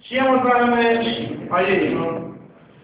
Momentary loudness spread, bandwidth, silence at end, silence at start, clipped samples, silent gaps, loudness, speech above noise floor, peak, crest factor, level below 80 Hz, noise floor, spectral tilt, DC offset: 10 LU; 4 kHz; 0.35 s; 0.05 s; under 0.1%; none; -19 LUFS; 26 dB; -4 dBFS; 14 dB; -54 dBFS; -44 dBFS; -9 dB/octave; under 0.1%